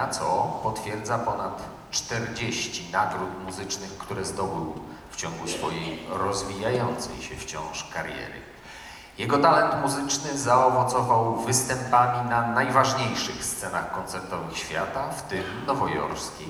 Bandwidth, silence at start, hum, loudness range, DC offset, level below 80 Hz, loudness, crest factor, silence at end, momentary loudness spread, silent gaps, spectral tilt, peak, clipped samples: over 20 kHz; 0 s; none; 8 LU; under 0.1%; -52 dBFS; -26 LUFS; 20 dB; 0 s; 13 LU; none; -3.5 dB/octave; -6 dBFS; under 0.1%